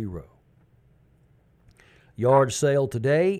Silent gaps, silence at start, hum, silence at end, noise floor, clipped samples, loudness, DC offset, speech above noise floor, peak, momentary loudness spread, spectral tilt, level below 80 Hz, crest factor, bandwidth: none; 0 s; none; 0 s; -60 dBFS; under 0.1%; -22 LUFS; under 0.1%; 38 dB; -8 dBFS; 14 LU; -6 dB/octave; -56 dBFS; 18 dB; 14 kHz